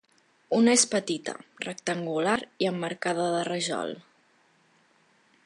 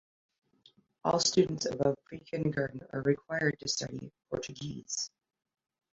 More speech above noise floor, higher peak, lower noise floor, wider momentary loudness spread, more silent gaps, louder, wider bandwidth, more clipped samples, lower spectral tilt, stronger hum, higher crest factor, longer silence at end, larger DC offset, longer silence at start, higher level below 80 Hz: first, 37 dB vs 33 dB; first, -6 dBFS vs -12 dBFS; about the same, -64 dBFS vs -66 dBFS; first, 16 LU vs 13 LU; neither; first, -27 LUFS vs -33 LUFS; first, 11.5 kHz vs 8.2 kHz; neither; about the same, -3 dB/octave vs -4 dB/octave; neither; about the same, 22 dB vs 22 dB; first, 1.45 s vs 0.85 s; neither; second, 0.5 s vs 1.05 s; second, -74 dBFS vs -64 dBFS